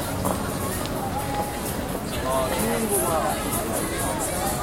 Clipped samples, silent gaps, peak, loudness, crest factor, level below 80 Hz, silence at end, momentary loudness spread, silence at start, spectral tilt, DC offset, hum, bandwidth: under 0.1%; none; -8 dBFS; -25 LUFS; 18 dB; -38 dBFS; 0 s; 5 LU; 0 s; -4 dB/octave; under 0.1%; none; 16.5 kHz